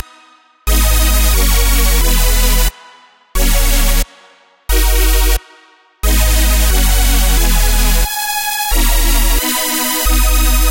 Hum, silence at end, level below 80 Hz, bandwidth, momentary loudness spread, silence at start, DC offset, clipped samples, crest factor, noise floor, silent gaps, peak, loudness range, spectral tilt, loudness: none; 0 s; -12 dBFS; 16.5 kHz; 6 LU; 0.65 s; under 0.1%; under 0.1%; 12 dB; -46 dBFS; none; 0 dBFS; 2 LU; -3 dB/octave; -13 LUFS